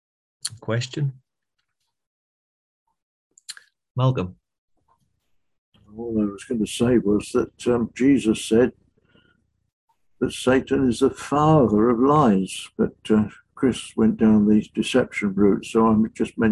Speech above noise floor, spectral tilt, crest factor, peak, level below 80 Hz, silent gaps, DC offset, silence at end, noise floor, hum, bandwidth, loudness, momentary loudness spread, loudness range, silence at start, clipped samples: 59 dB; -6.5 dB/octave; 16 dB; -6 dBFS; -48 dBFS; 2.07-2.86 s, 3.02-3.30 s, 3.91-3.95 s, 4.58-4.68 s, 5.58-5.72 s, 9.72-9.88 s; under 0.1%; 0 s; -79 dBFS; none; 12 kHz; -21 LUFS; 13 LU; 11 LU; 0.45 s; under 0.1%